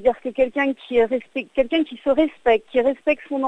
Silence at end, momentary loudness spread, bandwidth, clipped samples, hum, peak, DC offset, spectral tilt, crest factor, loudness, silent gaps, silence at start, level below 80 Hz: 0 s; 4 LU; 8.4 kHz; under 0.1%; none; -6 dBFS; under 0.1%; -5.5 dB/octave; 16 dB; -21 LUFS; none; 0 s; -50 dBFS